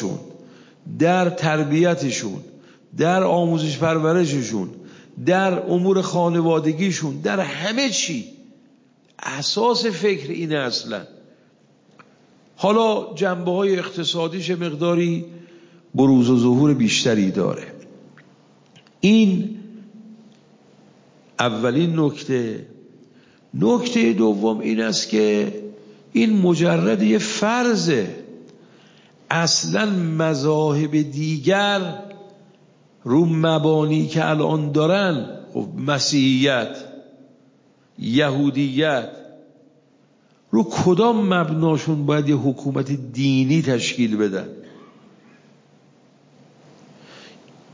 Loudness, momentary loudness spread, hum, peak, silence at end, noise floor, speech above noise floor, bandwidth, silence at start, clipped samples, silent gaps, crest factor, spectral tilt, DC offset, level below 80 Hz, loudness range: -20 LUFS; 13 LU; none; 0 dBFS; 0.45 s; -57 dBFS; 38 dB; 7.6 kHz; 0 s; under 0.1%; none; 20 dB; -5.5 dB/octave; under 0.1%; -64 dBFS; 4 LU